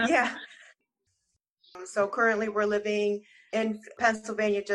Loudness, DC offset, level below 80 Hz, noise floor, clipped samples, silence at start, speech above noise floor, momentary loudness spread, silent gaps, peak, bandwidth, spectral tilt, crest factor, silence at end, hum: -28 LUFS; under 0.1%; -70 dBFS; -79 dBFS; under 0.1%; 0 s; 51 dB; 11 LU; 1.50-1.54 s; -10 dBFS; 11 kHz; -4 dB/octave; 18 dB; 0 s; none